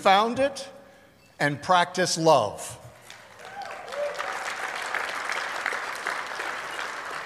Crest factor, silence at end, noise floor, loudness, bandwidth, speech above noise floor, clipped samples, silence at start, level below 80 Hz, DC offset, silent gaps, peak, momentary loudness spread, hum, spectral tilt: 22 dB; 0 s; -54 dBFS; -26 LUFS; 15.5 kHz; 32 dB; under 0.1%; 0 s; -66 dBFS; under 0.1%; none; -6 dBFS; 20 LU; none; -3 dB/octave